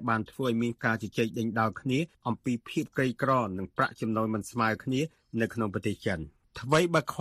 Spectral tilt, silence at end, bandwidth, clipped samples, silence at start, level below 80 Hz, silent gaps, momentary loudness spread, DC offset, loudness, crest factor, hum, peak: -6 dB/octave; 0 s; 15 kHz; under 0.1%; 0 s; -60 dBFS; none; 6 LU; under 0.1%; -30 LUFS; 20 dB; none; -10 dBFS